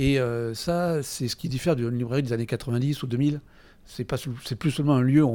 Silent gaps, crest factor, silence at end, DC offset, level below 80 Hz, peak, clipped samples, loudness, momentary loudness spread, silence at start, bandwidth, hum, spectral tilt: none; 16 dB; 0 s; under 0.1%; -48 dBFS; -10 dBFS; under 0.1%; -26 LUFS; 9 LU; 0 s; 18 kHz; none; -6.5 dB/octave